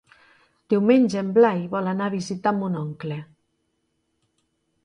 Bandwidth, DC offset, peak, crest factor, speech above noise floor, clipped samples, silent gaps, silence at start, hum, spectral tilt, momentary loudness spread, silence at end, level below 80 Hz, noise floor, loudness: 10.5 kHz; under 0.1%; -6 dBFS; 18 dB; 52 dB; under 0.1%; none; 0.7 s; none; -7 dB/octave; 13 LU; 1.6 s; -68 dBFS; -73 dBFS; -22 LUFS